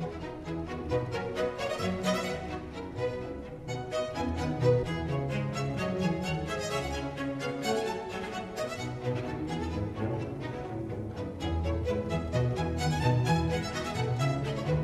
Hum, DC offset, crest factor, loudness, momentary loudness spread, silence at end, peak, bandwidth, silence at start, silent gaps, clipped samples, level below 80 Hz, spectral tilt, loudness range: none; under 0.1%; 18 dB; -32 LUFS; 9 LU; 0 s; -14 dBFS; 13.5 kHz; 0 s; none; under 0.1%; -46 dBFS; -6 dB/octave; 4 LU